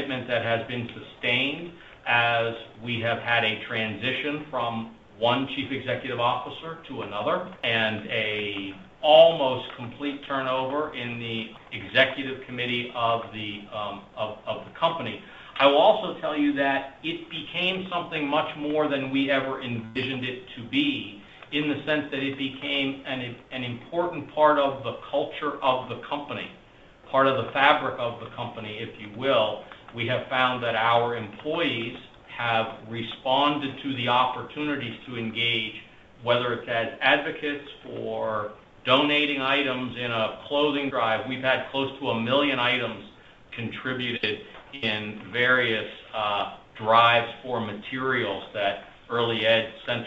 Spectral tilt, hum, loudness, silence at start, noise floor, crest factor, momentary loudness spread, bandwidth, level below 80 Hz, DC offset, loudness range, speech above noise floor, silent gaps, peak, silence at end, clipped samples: -6.5 dB/octave; none; -26 LUFS; 0 s; -51 dBFS; 24 dB; 13 LU; 7.8 kHz; -62 dBFS; under 0.1%; 4 LU; 25 dB; none; -2 dBFS; 0 s; under 0.1%